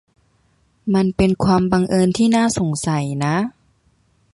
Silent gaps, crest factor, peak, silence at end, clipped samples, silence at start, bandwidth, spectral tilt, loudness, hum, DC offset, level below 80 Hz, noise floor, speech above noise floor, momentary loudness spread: none; 16 dB; -4 dBFS; 0.85 s; under 0.1%; 0.85 s; 11.5 kHz; -6 dB/octave; -18 LUFS; none; under 0.1%; -42 dBFS; -60 dBFS; 44 dB; 6 LU